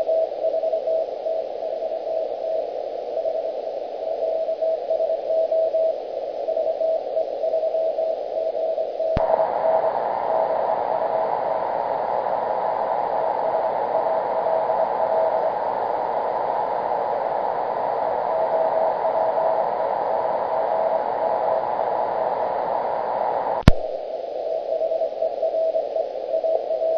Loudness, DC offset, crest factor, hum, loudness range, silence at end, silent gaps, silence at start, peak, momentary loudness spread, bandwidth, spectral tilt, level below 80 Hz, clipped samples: -23 LUFS; under 0.1%; 22 dB; none; 3 LU; 0 s; none; 0 s; 0 dBFS; 6 LU; 5.4 kHz; -8 dB/octave; -40 dBFS; under 0.1%